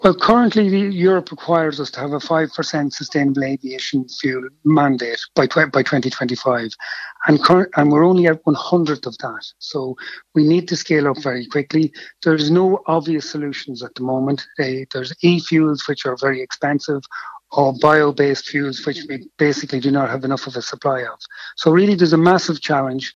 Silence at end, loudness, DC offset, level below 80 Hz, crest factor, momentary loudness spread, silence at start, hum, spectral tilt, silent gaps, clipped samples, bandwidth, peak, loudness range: 0.05 s; -18 LUFS; under 0.1%; -58 dBFS; 16 dB; 12 LU; 0 s; none; -6 dB/octave; none; under 0.1%; 7.6 kHz; 0 dBFS; 4 LU